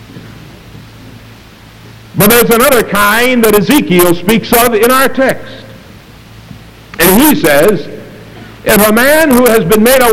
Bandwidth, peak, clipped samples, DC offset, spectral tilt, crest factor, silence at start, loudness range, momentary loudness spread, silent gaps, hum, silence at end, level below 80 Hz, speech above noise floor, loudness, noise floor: over 20 kHz; 0 dBFS; 0.9%; under 0.1%; -4 dB/octave; 10 dB; 0 s; 4 LU; 13 LU; none; none; 0 s; -34 dBFS; 28 dB; -7 LUFS; -35 dBFS